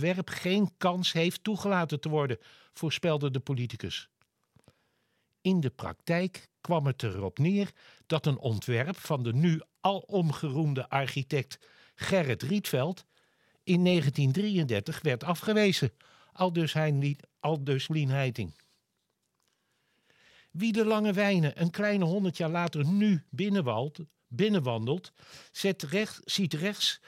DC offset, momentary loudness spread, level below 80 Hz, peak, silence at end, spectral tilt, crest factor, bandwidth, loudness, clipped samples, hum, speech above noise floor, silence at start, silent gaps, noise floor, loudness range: under 0.1%; 8 LU; -72 dBFS; -10 dBFS; 0.1 s; -6 dB/octave; 20 dB; 16 kHz; -30 LUFS; under 0.1%; none; 51 dB; 0 s; none; -80 dBFS; 5 LU